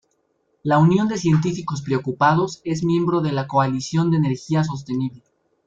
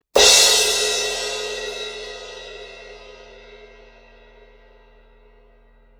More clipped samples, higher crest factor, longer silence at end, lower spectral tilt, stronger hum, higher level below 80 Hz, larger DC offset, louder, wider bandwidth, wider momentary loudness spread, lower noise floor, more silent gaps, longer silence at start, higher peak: neither; second, 16 dB vs 22 dB; second, 0.5 s vs 2.45 s; first, -7 dB/octave vs 1.5 dB/octave; neither; second, -56 dBFS vs -48 dBFS; neither; second, -20 LUFS vs -15 LUFS; second, 7.8 kHz vs over 20 kHz; second, 9 LU vs 27 LU; first, -68 dBFS vs -52 dBFS; neither; first, 0.65 s vs 0.15 s; second, -4 dBFS vs 0 dBFS